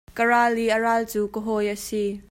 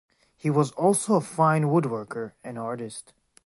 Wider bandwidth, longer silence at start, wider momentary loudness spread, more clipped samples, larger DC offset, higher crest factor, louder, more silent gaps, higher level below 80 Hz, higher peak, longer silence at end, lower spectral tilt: first, 16 kHz vs 11.5 kHz; second, 0.15 s vs 0.45 s; second, 8 LU vs 14 LU; neither; neither; about the same, 16 dB vs 18 dB; about the same, -23 LUFS vs -25 LUFS; neither; first, -54 dBFS vs -70 dBFS; about the same, -6 dBFS vs -6 dBFS; second, 0.1 s vs 0.45 s; second, -4 dB/octave vs -6.5 dB/octave